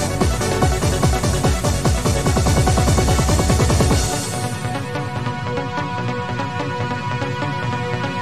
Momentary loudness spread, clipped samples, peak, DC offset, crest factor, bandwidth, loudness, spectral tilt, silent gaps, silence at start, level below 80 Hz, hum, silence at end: 8 LU; under 0.1%; -2 dBFS; 1%; 16 dB; 16 kHz; -19 LUFS; -5 dB/octave; none; 0 s; -26 dBFS; none; 0 s